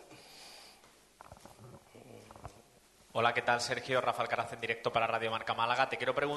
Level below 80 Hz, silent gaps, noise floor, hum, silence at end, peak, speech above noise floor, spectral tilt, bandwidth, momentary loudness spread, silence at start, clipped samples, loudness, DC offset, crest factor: -68 dBFS; none; -63 dBFS; none; 0 s; -14 dBFS; 30 dB; -3.5 dB/octave; 12.5 kHz; 23 LU; 0 s; under 0.1%; -33 LUFS; under 0.1%; 22 dB